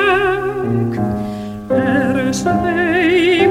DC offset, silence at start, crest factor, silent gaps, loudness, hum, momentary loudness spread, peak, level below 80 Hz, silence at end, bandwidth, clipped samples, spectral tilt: under 0.1%; 0 s; 12 dB; none; -16 LUFS; none; 8 LU; -2 dBFS; -40 dBFS; 0 s; 15 kHz; under 0.1%; -5.5 dB/octave